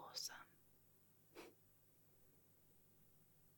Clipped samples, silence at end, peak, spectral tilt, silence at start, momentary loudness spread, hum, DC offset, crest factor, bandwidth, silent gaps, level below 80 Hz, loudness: under 0.1%; 0 s; -34 dBFS; -0.5 dB/octave; 0 s; 16 LU; none; under 0.1%; 26 dB; 17.5 kHz; none; -88 dBFS; -54 LUFS